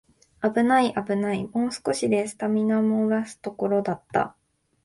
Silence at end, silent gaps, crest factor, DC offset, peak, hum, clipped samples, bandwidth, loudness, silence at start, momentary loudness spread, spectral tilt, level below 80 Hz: 0.55 s; none; 16 dB; under 0.1%; -8 dBFS; none; under 0.1%; 11.5 kHz; -24 LUFS; 0.4 s; 7 LU; -5.5 dB/octave; -64 dBFS